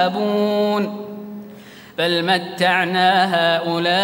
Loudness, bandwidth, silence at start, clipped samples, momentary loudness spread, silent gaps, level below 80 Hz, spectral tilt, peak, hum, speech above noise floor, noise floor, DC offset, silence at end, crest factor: -18 LUFS; 16.5 kHz; 0 s; under 0.1%; 17 LU; none; -68 dBFS; -5 dB/octave; -2 dBFS; none; 23 dB; -40 dBFS; under 0.1%; 0 s; 16 dB